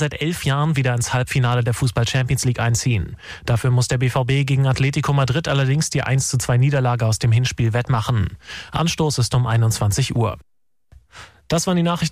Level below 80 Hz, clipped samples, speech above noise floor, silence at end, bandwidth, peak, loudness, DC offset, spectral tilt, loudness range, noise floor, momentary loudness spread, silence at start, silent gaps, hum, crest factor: -40 dBFS; under 0.1%; 33 dB; 0 s; 15.5 kHz; -10 dBFS; -19 LUFS; under 0.1%; -5 dB/octave; 2 LU; -51 dBFS; 5 LU; 0 s; none; none; 10 dB